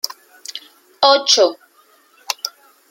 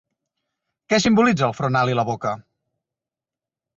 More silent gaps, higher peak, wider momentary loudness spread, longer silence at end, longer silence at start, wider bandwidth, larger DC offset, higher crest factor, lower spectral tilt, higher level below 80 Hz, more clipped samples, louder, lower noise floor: neither; first, 0 dBFS vs -4 dBFS; first, 21 LU vs 11 LU; second, 0.4 s vs 1.35 s; second, 0.05 s vs 0.9 s; first, 16.5 kHz vs 8 kHz; neither; about the same, 20 dB vs 18 dB; second, 0.5 dB/octave vs -5.5 dB/octave; second, -74 dBFS vs -56 dBFS; neither; first, -15 LUFS vs -20 LUFS; second, -53 dBFS vs -89 dBFS